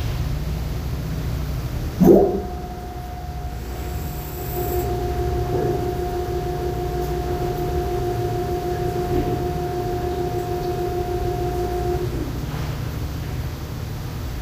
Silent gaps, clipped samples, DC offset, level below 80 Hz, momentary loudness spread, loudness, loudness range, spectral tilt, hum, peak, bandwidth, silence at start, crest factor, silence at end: none; under 0.1%; under 0.1%; -30 dBFS; 7 LU; -24 LUFS; 4 LU; -7 dB/octave; none; -2 dBFS; 16 kHz; 0 s; 22 dB; 0 s